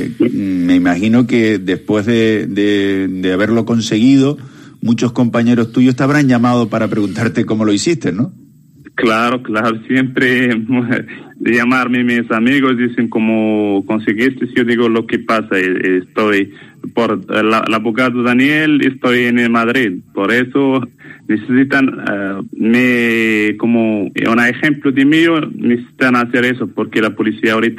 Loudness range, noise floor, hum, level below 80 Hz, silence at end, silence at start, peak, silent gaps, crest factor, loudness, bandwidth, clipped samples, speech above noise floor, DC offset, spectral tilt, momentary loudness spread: 2 LU; -41 dBFS; none; -54 dBFS; 0 s; 0 s; 0 dBFS; none; 14 dB; -13 LUFS; 13 kHz; under 0.1%; 28 dB; under 0.1%; -6 dB/octave; 6 LU